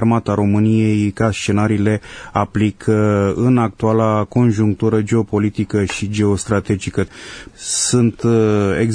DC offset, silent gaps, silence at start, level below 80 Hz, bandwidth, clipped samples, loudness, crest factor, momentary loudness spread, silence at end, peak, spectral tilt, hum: under 0.1%; none; 0 s; -44 dBFS; 10 kHz; under 0.1%; -17 LUFS; 14 dB; 6 LU; 0 s; 0 dBFS; -6 dB/octave; none